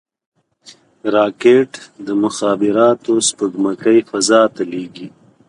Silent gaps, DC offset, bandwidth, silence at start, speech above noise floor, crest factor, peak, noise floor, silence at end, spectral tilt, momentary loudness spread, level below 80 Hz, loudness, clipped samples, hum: none; under 0.1%; 11 kHz; 1.05 s; 31 dB; 16 dB; 0 dBFS; -46 dBFS; 0.4 s; -3.5 dB/octave; 14 LU; -64 dBFS; -15 LUFS; under 0.1%; none